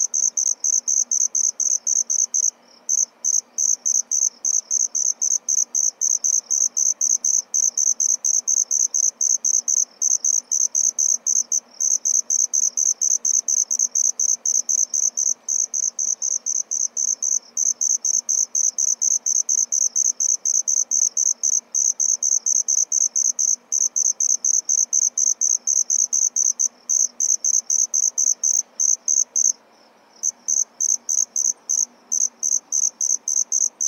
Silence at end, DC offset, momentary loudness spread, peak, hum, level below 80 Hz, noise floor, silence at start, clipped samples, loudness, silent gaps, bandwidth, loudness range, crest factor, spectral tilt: 0 s; under 0.1%; 4 LU; -6 dBFS; none; under -90 dBFS; -53 dBFS; 0 s; under 0.1%; -18 LUFS; none; 17 kHz; 2 LU; 16 dB; 4.5 dB/octave